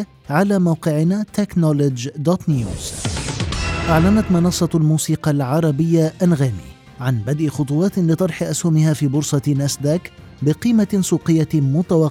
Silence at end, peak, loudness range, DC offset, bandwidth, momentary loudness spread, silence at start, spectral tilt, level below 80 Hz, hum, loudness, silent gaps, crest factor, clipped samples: 0 s; -2 dBFS; 2 LU; under 0.1%; 15.5 kHz; 7 LU; 0 s; -6.5 dB/octave; -38 dBFS; none; -18 LUFS; none; 16 dB; under 0.1%